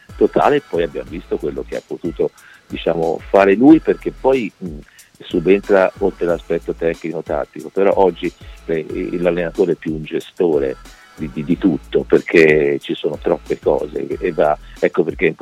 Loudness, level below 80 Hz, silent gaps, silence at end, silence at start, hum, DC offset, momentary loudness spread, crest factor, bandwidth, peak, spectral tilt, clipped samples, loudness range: -17 LUFS; -40 dBFS; none; 0.1 s; 0.1 s; none; under 0.1%; 14 LU; 16 dB; 12.5 kHz; 0 dBFS; -7 dB/octave; under 0.1%; 4 LU